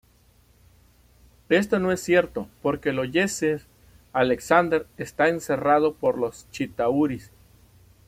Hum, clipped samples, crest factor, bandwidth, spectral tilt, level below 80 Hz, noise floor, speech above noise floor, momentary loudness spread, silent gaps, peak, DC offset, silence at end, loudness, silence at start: 60 Hz at -55 dBFS; under 0.1%; 22 dB; 16 kHz; -5 dB/octave; -56 dBFS; -58 dBFS; 35 dB; 10 LU; none; -4 dBFS; under 0.1%; 0.85 s; -24 LUFS; 1.5 s